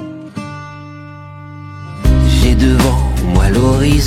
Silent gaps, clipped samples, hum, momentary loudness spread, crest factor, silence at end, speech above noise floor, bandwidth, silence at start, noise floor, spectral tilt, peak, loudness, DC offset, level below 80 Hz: none; under 0.1%; none; 21 LU; 12 dB; 0 s; 21 dB; 15.5 kHz; 0 s; -31 dBFS; -6 dB/octave; 0 dBFS; -12 LUFS; under 0.1%; -16 dBFS